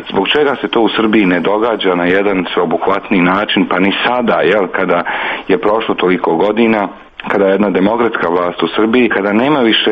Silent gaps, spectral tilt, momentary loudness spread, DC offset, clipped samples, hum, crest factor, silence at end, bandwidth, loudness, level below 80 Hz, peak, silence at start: none; -7.5 dB/octave; 4 LU; under 0.1%; under 0.1%; none; 12 dB; 0 s; 6 kHz; -12 LUFS; -48 dBFS; 0 dBFS; 0 s